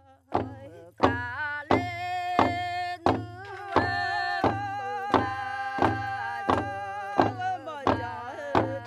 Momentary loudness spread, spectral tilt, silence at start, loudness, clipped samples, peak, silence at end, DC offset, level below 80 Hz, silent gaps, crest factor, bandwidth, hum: 7 LU; -6.5 dB/octave; 0.3 s; -28 LUFS; under 0.1%; -6 dBFS; 0 s; under 0.1%; -58 dBFS; none; 24 dB; 13 kHz; none